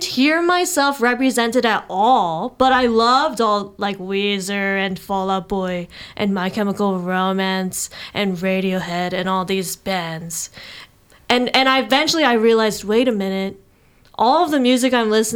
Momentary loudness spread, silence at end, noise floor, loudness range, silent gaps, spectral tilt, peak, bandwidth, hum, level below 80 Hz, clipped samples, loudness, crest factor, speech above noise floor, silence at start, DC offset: 10 LU; 0 s; -53 dBFS; 5 LU; none; -4 dB/octave; 0 dBFS; 17.5 kHz; none; -52 dBFS; under 0.1%; -18 LUFS; 18 dB; 34 dB; 0 s; under 0.1%